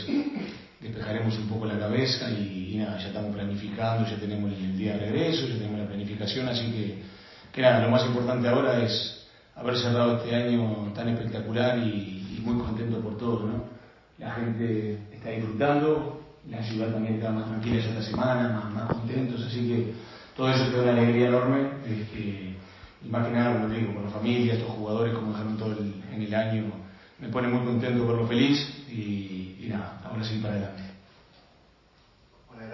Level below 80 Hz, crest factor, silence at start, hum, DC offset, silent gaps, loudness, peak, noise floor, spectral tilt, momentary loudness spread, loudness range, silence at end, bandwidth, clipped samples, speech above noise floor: -54 dBFS; 20 dB; 0 s; none; under 0.1%; none; -28 LUFS; -8 dBFS; -60 dBFS; -7.5 dB/octave; 13 LU; 5 LU; 0 s; 6 kHz; under 0.1%; 33 dB